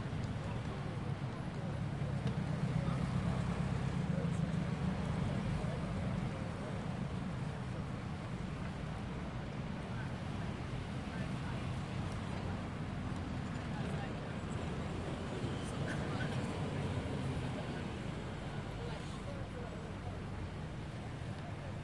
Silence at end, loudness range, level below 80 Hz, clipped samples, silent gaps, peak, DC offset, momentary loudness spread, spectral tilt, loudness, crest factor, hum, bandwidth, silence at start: 0 s; 5 LU; -52 dBFS; under 0.1%; none; -24 dBFS; under 0.1%; 7 LU; -7 dB/octave; -40 LUFS; 16 dB; none; 11.5 kHz; 0 s